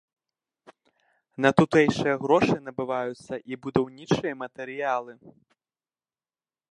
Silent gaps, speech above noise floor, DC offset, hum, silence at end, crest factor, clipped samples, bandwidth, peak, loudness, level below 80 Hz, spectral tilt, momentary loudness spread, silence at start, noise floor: none; over 65 dB; under 0.1%; none; 1.4 s; 24 dB; under 0.1%; 11 kHz; -4 dBFS; -25 LUFS; -60 dBFS; -6.5 dB/octave; 15 LU; 1.4 s; under -90 dBFS